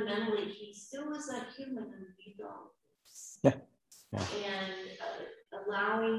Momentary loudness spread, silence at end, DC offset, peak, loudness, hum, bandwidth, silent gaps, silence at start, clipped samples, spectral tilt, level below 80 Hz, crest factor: 18 LU; 0 s; under 0.1%; -10 dBFS; -37 LUFS; none; 14.5 kHz; none; 0 s; under 0.1%; -5 dB/octave; -66 dBFS; 28 dB